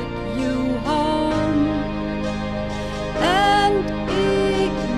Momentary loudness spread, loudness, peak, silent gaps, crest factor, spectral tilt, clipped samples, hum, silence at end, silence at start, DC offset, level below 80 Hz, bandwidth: 9 LU; -21 LUFS; -6 dBFS; none; 14 dB; -5.5 dB/octave; under 0.1%; none; 0 s; 0 s; under 0.1%; -34 dBFS; 12 kHz